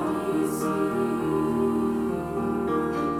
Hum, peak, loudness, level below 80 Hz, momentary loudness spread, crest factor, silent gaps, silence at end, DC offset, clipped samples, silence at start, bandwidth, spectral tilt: none; -14 dBFS; -26 LUFS; -50 dBFS; 3 LU; 12 dB; none; 0 s; under 0.1%; under 0.1%; 0 s; 16.5 kHz; -7 dB/octave